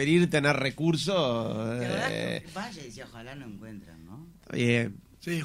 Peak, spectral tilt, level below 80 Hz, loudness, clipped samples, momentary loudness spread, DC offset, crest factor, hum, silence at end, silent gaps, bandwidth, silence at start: -8 dBFS; -5.5 dB/octave; -58 dBFS; -28 LUFS; under 0.1%; 21 LU; under 0.1%; 20 dB; none; 0 s; none; 15.5 kHz; 0 s